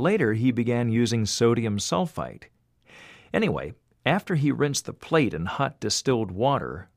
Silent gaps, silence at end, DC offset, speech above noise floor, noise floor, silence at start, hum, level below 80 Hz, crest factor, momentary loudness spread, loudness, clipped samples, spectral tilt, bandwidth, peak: none; 0.1 s; under 0.1%; 29 dB; -53 dBFS; 0 s; none; -54 dBFS; 18 dB; 7 LU; -25 LUFS; under 0.1%; -5 dB/octave; 15.5 kHz; -6 dBFS